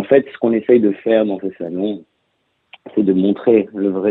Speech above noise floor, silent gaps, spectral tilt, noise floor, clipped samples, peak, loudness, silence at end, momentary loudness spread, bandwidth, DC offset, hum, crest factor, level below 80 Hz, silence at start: 51 dB; none; -10.5 dB/octave; -67 dBFS; under 0.1%; 0 dBFS; -17 LUFS; 0 s; 10 LU; 4.1 kHz; under 0.1%; none; 16 dB; -62 dBFS; 0 s